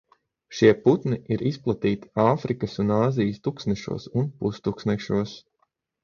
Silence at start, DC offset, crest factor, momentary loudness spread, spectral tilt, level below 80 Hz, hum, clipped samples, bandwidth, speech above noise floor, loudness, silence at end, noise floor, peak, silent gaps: 0.5 s; under 0.1%; 20 dB; 9 LU; -7.5 dB/octave; -54 dBFS; none; under 0.1%; 7.2 kHz; 49 dB; -24 LUFS; 0.65 s; -72 dBFS; -4 dBFS; none